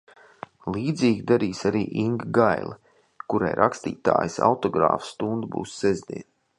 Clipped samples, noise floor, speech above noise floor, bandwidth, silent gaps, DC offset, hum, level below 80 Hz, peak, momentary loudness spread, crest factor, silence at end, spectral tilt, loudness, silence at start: under 0.1%; -44 dBFS; 21 dB; 11.5 kHz; none; under 0.1%; none; -56 dBFS; -2 dBFS; 15 LU; 22 dB; 0.35 s; -6.5 dB/octave; -24 LUFS; 0.65 s